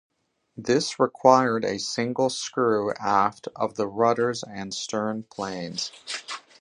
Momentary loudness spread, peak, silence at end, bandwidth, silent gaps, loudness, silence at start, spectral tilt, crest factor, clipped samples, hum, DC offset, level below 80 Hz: 13 LU; -2 dBFS; 0.2 s; 11 kHz; none; -25 LUFS; 0.55 s; -4 dB/octave; 24 dB; under 0.1%; none; under 0.1%; -66 dBFS